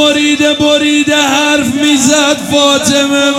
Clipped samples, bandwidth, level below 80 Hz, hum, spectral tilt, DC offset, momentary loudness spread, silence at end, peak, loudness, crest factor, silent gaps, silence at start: 0.2%; 16 kHz; -48 dBFS; none; -2.5 dB/octave; under 0.1%; 2 LU; 0 s; 0 dBFS; -9 LUFS; 10 dB; none; 0 s